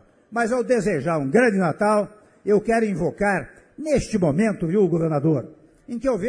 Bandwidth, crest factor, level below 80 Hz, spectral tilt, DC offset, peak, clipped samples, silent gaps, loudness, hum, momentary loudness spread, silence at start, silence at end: 10.5 kHz; 16 dB; -48 dBFS; -7 dB/octave; under 0.1%; -6 dBFS; under 0.1%; none; -21 LUFS; none; 12 LU; 0.3 s; 0 s